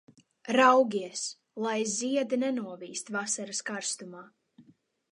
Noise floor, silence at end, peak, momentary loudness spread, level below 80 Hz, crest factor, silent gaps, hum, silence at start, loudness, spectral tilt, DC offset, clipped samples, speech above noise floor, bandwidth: -62 dBFS; 0.5 s; -8 dBFS; 17 LU; -84 dBFS; 22 dB; none; none; 0.45 s; -29 LUFS; -2.5 dB/octave; under 0.1%; under 0.1%; 33 dB; 11 kHz